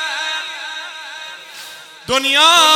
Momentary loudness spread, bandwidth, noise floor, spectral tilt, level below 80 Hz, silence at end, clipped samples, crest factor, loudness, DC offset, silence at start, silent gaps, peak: 23 LU; over 20 kHz; -36 dBFS; 0.5 dB/octave; -58 dBFS; 0 s; under 0.1%; 18 dB; -14 LUFS; under 0.1%; 0 s; none; 0 dBFS